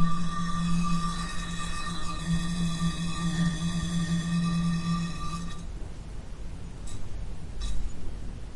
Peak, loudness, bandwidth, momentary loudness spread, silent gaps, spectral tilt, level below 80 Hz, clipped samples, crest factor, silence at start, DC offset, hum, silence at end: -12 dBFS; -31 LUFS; 11.5 kHz; 14 LU; none; -5.5 dB/octave; -36 dBFS; under 0.1%; 16 dB; 0 s; under 0.1%; none; 0 s